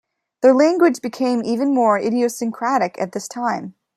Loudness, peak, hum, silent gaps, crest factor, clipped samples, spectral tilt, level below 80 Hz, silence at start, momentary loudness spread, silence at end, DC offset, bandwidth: -18 LUFS; -2 dBFS; none; none; 16 dB; under 0.1%; -5 dB/octave; -70 dBFS; 0.4 s; 10 LU; 0.25 s; under 0.1%; 14 kHz